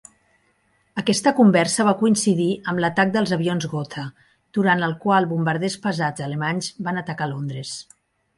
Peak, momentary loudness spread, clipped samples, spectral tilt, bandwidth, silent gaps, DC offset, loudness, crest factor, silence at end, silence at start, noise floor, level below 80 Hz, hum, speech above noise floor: -4 dBFS; 12 LU; under 0.1%; -5 dB/octave; 11.5 kHz; none; under 0.1%; -21 LUFS; 18 dB; 0.55 s; 0.95 s; -64 dBFS; -64 dBFS; none; 44 dB